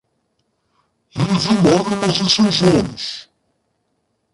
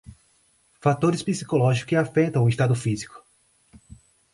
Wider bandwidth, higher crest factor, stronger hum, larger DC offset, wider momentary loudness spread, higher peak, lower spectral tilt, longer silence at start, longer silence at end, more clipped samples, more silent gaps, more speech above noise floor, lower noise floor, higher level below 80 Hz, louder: about the same, 11.5 kHz vs 11.5 kHz; about the same, 16 dB vs 16 dB; neither; neither; first, 14 LU vs 7 LU; first, -2 dBFS vs -8 dBFS; second, -5 dB/octave vs -6.5 dB/octave; first, 1.15 s vs 0.85 s; about the same, 1.1 s vs 1.15 s; neither; neither; first, 53 dB vs 41 dB; first, -69 dBFS vs -63 dBFS; first, -46 dBFS vs -56 dBFS; first, -16 LUFS vs -23 LUFS